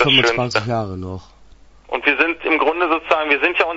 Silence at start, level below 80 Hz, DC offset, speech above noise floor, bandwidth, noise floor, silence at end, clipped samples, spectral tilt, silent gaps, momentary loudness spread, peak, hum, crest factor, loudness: 0 s; -50 dBFS; under 0.1%; 27 dB; 8 kHz; -45 dBFS; 0 s; under 0.1%; -4.5 dB/octave; none; 13 LU; 0 dBFS; none; 18 dB; -17 LUFS